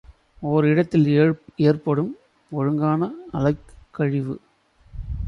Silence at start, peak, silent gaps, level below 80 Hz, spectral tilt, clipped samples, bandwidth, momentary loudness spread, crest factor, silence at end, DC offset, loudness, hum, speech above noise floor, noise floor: 0.1 s; -6 dBFS; none; -42 dBFS; -9.5 dB/octave; under 0.1%; 6.4 kHz; 14 LU; 16 dB; 0 s; under 0.1%; -22 LUFS; none; 32 dB; -53 dBFS